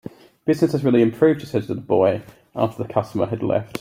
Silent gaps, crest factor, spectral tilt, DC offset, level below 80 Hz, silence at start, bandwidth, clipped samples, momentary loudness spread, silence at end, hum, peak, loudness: none; 18 dB; -8 dB/octave; under 0.1%; -58 dBFS; 0.45 s; 16 kHz; under 0.1%; 10 LU; 0 s; none; -4 dBFS; -21 LUFS